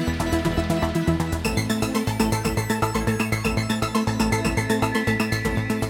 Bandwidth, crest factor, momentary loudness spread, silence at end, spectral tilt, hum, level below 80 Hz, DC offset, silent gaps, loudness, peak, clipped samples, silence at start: 18.5 kHz; 16 dB; 2 LU; 0 s; -5.5 dB/octave; none; -34 dBFS; under 0.1%; none; -23 LUFS; -6 dBFS; under 0.1%; 0 s